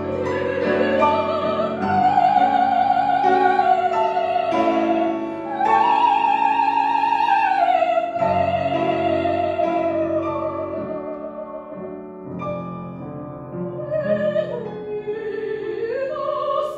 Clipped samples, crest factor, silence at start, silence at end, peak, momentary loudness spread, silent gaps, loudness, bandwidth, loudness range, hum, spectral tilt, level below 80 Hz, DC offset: under 0.1%; 16 dB; 0 s; 0 s; -4 dBFS; 15 LU; none; -20 LUFS; 7.8 kHz; 9 LU; none; -7 dB/octave; -60 dBFS; under 0.1%